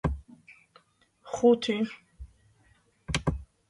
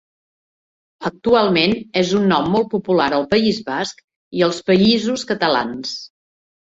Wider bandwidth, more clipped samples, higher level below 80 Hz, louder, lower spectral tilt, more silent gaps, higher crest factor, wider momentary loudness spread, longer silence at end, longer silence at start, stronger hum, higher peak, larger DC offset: first, 11.5 kHz vs 8 kHz; neither; first, -44 dBFS vs -54 dBFS; second, -28 LUFS vs -18 LUFS; about the same, -5.5 dB/octave vs -5 dB/octave; second, none vs 4.04-4.08 s, 4.16-4.31 s; first, 22 dB vs 16 dB; first, 20 LU vs 13 LU; second, 0.25 s vs 0.6 s; second, 0.05 s vs 1 s; neither; second, -8 dBFS vs -2 dBFS; neither